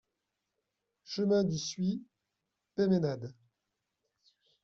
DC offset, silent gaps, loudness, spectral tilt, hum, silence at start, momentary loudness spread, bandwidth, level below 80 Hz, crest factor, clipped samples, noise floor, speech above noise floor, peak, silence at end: under 0.1%; none; -33 LUFS; -7 dB/octave; none; 1.1 s; 13 LU; 7.6 kHz; -72 dBFS; 18 dB; under 0.1%; -86 dBFS; 55 dB; -18 dBFS; 1.3 s